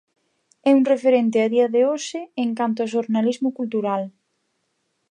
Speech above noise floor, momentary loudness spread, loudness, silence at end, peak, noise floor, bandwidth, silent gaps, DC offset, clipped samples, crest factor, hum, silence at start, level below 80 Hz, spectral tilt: 52 dB; 9 LU; -21 LUFS; 1 s; -6 dBFS; -72 dBFS; 9.8 kHz; none; under 0.1%; under 0.1%; 16 dB; none; 0.65 s; -78 dBFS; -5.5 dB/octave